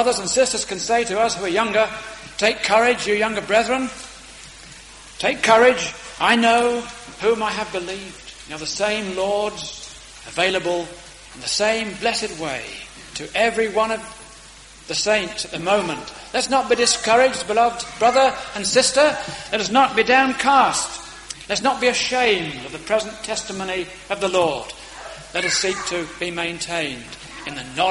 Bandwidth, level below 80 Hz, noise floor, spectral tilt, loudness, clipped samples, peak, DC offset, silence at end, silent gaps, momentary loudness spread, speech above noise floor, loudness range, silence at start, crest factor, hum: 11.5 kHz; -50 dBFS; -43 dBFS; -2 dB/octave; -20 LUFS; under 0.1%; -2 dBFS; under 0.1%; 0 s; none; 19 LU; 23 dB; 6 LU; 0 s; 20 dB; none